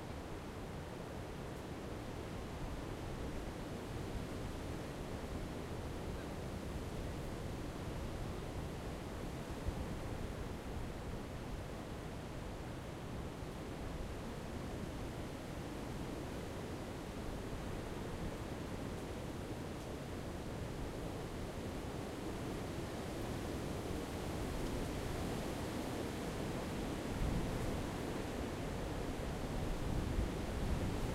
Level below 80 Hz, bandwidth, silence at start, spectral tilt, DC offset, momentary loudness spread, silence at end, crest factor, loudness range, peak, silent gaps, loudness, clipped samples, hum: -48 dBFS; 16 kHz; 0 s; -6 dB/octave; under 0.1%; 6 LU; 0 s; 18 dB; 5 LU; -24 dBFS; none; -44 LUFS; under 0.1%; none